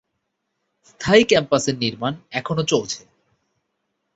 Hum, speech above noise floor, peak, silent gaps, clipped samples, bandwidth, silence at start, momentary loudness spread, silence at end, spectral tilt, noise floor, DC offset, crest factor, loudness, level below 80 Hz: none; 56 dB; -2 dBFS; none; under 0.1%; 8 kHz; 1 s; 14 LU; 1.15 s; -4 dB/octave; -76 dBFS; under 0.1%; 20 dB; -20 LUFS; -54 dBFS